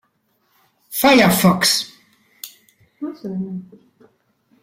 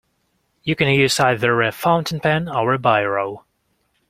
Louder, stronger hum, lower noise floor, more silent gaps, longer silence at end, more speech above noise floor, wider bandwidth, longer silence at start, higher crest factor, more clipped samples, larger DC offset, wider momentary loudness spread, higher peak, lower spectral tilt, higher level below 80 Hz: about the same, -16 LUFS vs -18 LUFS; neither; about the same, -65 dBFS vs -67 dBFS; neither; first, 1 s vs 0.7 s; about the same, 49 dB vs 49 dB; about the same, 16.5 kHz vs 16 kHz; first, 0.9 s vs 0.65 s; about the same, 20 dB vs 18 dB; neither; neither; first, 25 LU vs 9 LU; about the same, -2 dBFS vs -2 dBFS; about the same, -4 dB/octave vs -5 dB/octave; about the same, -54 dBFS vs -54 dBFS